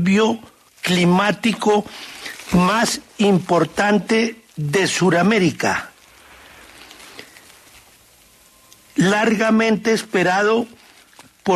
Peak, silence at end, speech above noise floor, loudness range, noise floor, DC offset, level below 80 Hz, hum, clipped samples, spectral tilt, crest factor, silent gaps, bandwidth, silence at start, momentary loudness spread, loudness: -4 dBFS; 0 s; 34 dB; 7 LU; -51 dBFS; under 0.1%; -52 dBFS; none; under 0.1%; -5 dB/octave; 16 dB; none; 13.5 kHz; 0 s; 16 LU; -18 LUFS